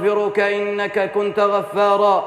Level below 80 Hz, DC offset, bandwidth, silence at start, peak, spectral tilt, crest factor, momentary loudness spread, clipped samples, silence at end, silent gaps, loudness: -68 dBFS; under 0.1%; 12.5 kHz; 0 s; -6 dBFS; -5.5 dB/octave; 12 dB; 5 LU; under 0.1%; 0 s; none; -18 LUFS